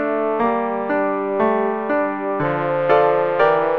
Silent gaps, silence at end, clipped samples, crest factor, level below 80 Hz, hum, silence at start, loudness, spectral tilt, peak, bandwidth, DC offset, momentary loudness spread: none; 0 s; under 0.1%; 16 dB; -58 dBFS; none; 0 s; -19 LUFS; -8.5 dB/octave; -4 dBFS; 5.6 kHz; 0.4%; 5 LU